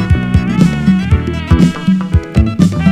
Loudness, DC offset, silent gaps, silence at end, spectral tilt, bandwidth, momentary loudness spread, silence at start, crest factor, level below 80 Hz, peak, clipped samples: -12 LUFS; under 0.1%; none; 0 s; -7.5 dB/octave; 11 kHz; 4 LU; 0 s; 10 dB; -20 dBFS; 0 dBFS; 0.5%